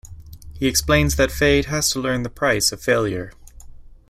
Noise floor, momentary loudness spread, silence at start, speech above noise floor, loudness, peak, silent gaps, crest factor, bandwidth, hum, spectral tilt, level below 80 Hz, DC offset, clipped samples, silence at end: -40 dBFS; 8 LU; 0.05 s; 21 dB; -19 LUFS; -2 dBFS; none; 18 dB; 16 kHz; none; -3.5 dB/octave; -34 dBFS; under 0.1%; under 0.1%; 0.15 s